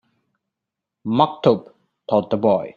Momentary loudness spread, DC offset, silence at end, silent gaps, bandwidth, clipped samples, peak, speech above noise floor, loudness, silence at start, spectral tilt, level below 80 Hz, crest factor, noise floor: 12 LU; under 0.1%; 0.05 s; none; 7 kHz; under 0.1%; -2 dBFS; 66 dB; -19 LUFS; 1.05 s; -8.5 dB/octave; -60 dBFS; 20 dB; -84 dBFS